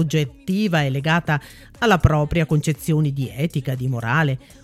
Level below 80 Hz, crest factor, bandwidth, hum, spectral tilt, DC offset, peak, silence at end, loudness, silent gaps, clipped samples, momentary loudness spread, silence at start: -36 dBFS; 20 dB; 14.5 kHz; none; -6.5 dB/octave; under 0.1%; -2 dBFS; 0.25 s; -21 LUFS; none; under 0.1%; 7 LU; 0 s